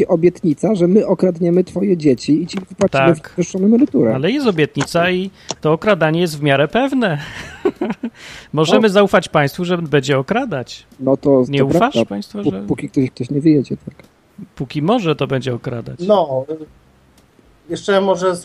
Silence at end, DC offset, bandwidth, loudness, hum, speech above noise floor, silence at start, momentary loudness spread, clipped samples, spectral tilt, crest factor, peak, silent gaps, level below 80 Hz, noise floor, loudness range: 0 s; under 0.1%; 14.5 kHz; -16 LUFS; none; 35 dB; 0 s; 11 LU; under 0.1%; -6.5 dB/octave; 16 dB; 0 dBFS; none; -50 dBFS; -51 dBFS; 4 LU